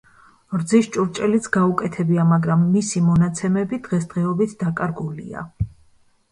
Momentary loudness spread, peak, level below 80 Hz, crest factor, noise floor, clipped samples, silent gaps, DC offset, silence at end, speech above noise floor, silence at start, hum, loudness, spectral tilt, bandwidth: 12 LU; -4 dBFS; -48 dBFS; 16 dB; -56 dBFS; under 0.1%; none; under 0.1%; 0.65 s; 36 dB; 0.5 s; none; -20 LUFS; -7 dB/octave; 11 kHz